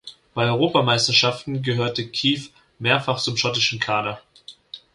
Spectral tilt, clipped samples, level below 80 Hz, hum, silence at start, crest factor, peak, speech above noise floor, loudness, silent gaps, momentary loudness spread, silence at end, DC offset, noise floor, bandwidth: -4 dB/octave; under 0.1%; -58 dBFS; none; 0.05 s; 20 dB; -2 dBFS; 21 dB; -20 LUFS; none; 13 LU; 0.15 s; under 0.1%; -43 dBFS; 11.5 kHz